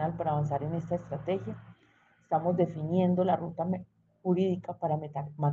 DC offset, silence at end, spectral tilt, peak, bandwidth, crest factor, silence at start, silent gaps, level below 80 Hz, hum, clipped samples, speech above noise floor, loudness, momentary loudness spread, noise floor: under 0.1%; 0 s; -10 dB/octave; -12 dBFS; 7.2 kHz; 18 dB; 0 s; none; -64 dBFS; none; under 0.1%; 35 dB; -31 LUFS; 9 LU; -65 dBFS